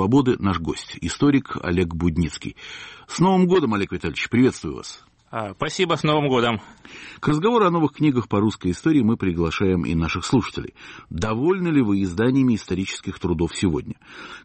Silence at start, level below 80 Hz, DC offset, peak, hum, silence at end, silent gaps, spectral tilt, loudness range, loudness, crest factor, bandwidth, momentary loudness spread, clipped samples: 0 s; -44 dBFS; under 0.1%; -8 dBFS; none; 0.05 s; none; -6.5 dB/octave; 2 LU; -21 LUFS; 14 dB; 8.8 kHz; 16 LU; under 0.1%